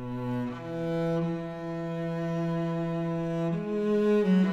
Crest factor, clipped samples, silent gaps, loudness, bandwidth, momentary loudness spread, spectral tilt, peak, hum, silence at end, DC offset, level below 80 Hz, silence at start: 14 dB; under 0.1%; none; -30 LUFS; 8 kHz; 10 LU; -8.5 dB/octave; -16 dBFS; none; 0 s; under 0.1%; -58 dBFS; 0 s